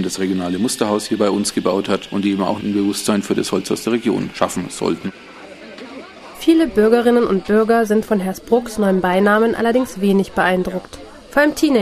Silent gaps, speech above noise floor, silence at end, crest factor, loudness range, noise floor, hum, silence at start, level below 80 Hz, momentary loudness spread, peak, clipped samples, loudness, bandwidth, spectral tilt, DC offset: none; 19 dB; 0 s; 18 dB; 5 LU; -36 dBFS; none; 0 s; -48 dBFS; 18 LU; 0 dBFS; under 0.1%; -17 LUFS; 15 kHz; -5 dB/octave; under 0.1%